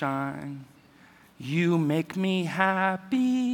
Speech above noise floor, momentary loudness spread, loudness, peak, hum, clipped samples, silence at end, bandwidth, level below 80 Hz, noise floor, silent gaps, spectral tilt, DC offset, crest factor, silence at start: 29 dB; 15 LU; -26 LUFS; -8 dBFS; none; under 0.1%; 0 s; 17.5 kHz; -72 dBFS; -55 dBFS; none; -6.5 dB/octave; under 0.1%; 20 dB; 0 s